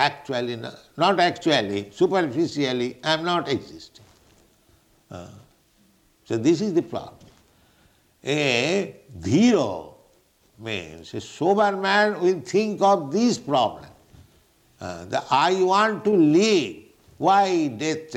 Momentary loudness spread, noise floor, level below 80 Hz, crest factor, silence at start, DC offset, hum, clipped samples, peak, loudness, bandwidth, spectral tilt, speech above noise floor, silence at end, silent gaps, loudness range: 17 LU; -61 dBFS; -62 dBFS; 18 dB; 0 s; under 0.1%; none; under 0.1%; -4 dBFS; -22 LUFS; 12.5 kHz; -5 dB/octave; 39 dB; 0 s; none; 7 LU